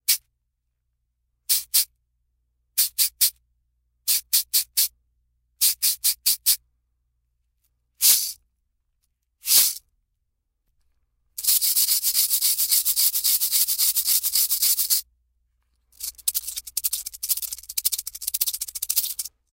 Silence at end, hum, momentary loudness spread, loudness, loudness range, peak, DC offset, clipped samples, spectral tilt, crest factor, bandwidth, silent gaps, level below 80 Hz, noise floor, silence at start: 0.25 s; 60 Hz at -75 dBFS; 11 LU; -20 LUFS; 6 LU; -2 dBFS; under 0.1%; under 0.1%; 4.5 dB/octave; 22 dB; 17 kHz; none; -64 dBFS; -77 dBFS; 0.1 s